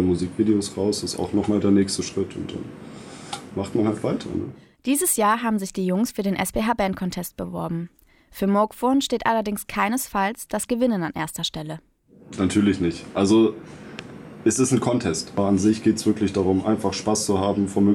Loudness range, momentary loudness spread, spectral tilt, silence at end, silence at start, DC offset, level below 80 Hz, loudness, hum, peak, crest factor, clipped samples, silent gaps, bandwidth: 3 LU; 15 LU; -5 dB/octave; 0 s; 0 s; under 0.1%; -52 dBFS; -23 LUFS; none; -6 dBFS; 16 dB; under 0.1%; none; 18 kHz